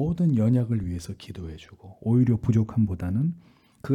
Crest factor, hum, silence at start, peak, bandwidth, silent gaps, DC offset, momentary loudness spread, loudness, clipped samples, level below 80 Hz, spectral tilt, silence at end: 14 dB; none; 0 s; -10 dBFS; 10.5 kHz; none; under 0.1%; 18 LU; -25 LUFS; under 0.1%; -50 dBFS; -9 dB/octave; 0 s